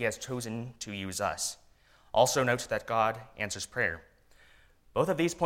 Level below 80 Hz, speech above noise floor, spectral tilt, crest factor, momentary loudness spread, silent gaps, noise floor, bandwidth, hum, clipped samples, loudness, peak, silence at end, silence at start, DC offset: -60 dBFS; 31 dB; -3.5 dB/octave; 22 dB; 12 LU; none; -61 dBFS; 16.5 kHz; none; under 0.1%; -31 LUFS; -10 dBFS; 0 s; 0 s; under 0.1%